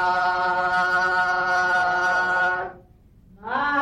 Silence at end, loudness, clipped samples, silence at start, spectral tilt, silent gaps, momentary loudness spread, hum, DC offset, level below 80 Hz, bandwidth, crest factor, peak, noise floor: 0 s; -21 LUFS; under 0.1%; 0 s; -3.5 dB/octave; none; 9 LU; none; under 0.1%; -54 dBFS; 12 kHz; 10 dB; -12 dBFS; -52 dBFS